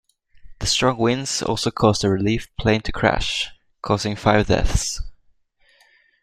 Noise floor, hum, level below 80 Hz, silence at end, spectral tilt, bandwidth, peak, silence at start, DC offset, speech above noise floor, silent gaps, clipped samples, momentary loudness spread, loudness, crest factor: -59 dBFS; none; -32 dBFS; 1.1 s; -4.5 dB/octave; 14.5 kHz; -2 dBFS; 0.45 s; under 0.1%; 40 dB; none; under 0.1%; 9 LU; -21 LUFS; 20 dB